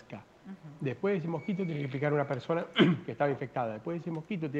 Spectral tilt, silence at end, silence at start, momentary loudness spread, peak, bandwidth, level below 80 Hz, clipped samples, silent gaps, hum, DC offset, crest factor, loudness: -8 dB/octave; 0 s; 0.1 s; 20 LU; -12 dBFS; 7.8 kHz; -72 dBFS; under 0.1%; none; none; under 0.1%; 20 dB; -32 LUFS